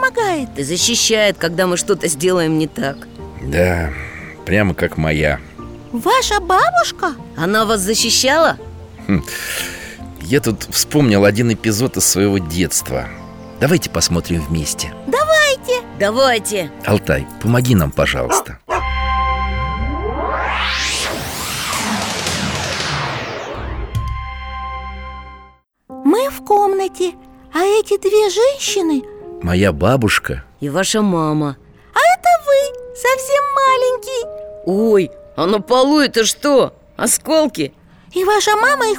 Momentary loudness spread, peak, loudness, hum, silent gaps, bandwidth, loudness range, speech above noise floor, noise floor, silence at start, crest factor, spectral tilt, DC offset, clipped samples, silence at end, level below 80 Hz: 13 LU; -2 dBFS; -16 LUFS; none; none; over 20 kHz; 5 LU; 31 dB; -46 dBFS; 0 s; 14 dB; -4 dB/octave; under 0.1%; under 0.1%; 0 s; -32 dBFS